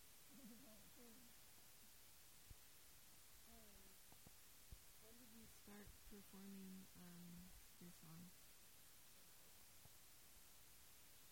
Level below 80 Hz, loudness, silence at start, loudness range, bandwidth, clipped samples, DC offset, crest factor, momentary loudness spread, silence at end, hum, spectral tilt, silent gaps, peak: -76 dBFS; -64 LUFS; 0 s; 3 LU; 16.5 kHz; under 0.1%; under 0.1%; 18 dB; 5 LU; 0 s; none; -3.5 dB/octave; none; -48 dBFS